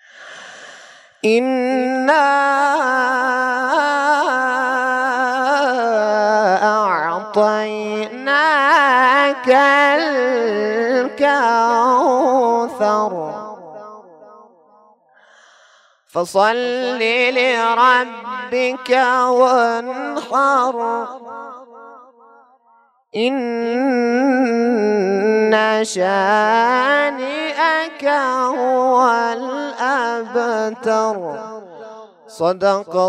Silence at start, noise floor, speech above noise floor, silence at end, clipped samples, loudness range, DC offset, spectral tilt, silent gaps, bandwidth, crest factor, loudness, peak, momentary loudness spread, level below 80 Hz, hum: 0.2 s; -55 dBFS; 39 dB; 0 s; under 0.1%; 8 LU; under 0.1%; -4 dB/octave; none; 12.5 kHz; 16 dB; -16 LUFS; 0 dBFS; 12 LU; -74 dBFS; none